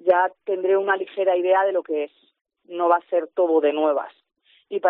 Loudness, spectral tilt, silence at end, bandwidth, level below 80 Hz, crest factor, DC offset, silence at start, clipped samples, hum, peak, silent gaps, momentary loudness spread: -22 LUFS; -1.5 dB/octave; 0 s; 4 kHz; -82 dBFS; 16 dB; under 0.1%; 0.05 s; under 0.1%; none; -6 dBFS; 2.41-2.45 s; 9 LU